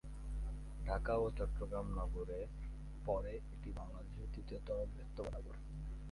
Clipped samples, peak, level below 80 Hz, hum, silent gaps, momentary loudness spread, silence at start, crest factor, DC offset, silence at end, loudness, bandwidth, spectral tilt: under 0.1%; -24 dBFS; -46 dBFS; none; none; 11 LU; 0.05 s; 18 dB; under 0.1%; 0 s; -45 LUFS; 11.5 kHz; -8 dB/octave